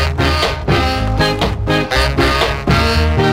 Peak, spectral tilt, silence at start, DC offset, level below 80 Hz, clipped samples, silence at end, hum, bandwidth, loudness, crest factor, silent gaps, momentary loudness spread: 0 dBFS; -5.5 dB/octave; 0 s; under 0.1%; -20 dBFS; under 0.1%; 0 s; none; 16 kHz; -14 LUFS; 14 dB; none; 3 LU